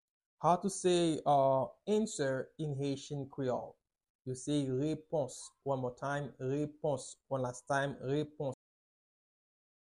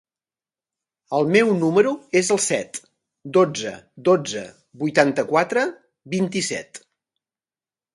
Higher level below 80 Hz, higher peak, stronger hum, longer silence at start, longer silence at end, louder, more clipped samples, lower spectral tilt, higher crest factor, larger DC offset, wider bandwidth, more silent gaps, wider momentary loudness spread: about the same, -70 dBFS vs -68 dBFS; second, -16 dBFS vs 0 dBFS; neither; second, 0.4 s vs 1.1 s; first, 1.3 s vs 1.15 s; second, -35 LUFS vs -21 LUFS; neither; about the same, -5.5 dB/octave vs -4.5 dB/octave; about the same, 20 dB vs 22 dB; neither; about the same, 12 kHz vs 11.5 kHz; first, 4.10-4.19 s vs none; second, 11 LU vs 14 LU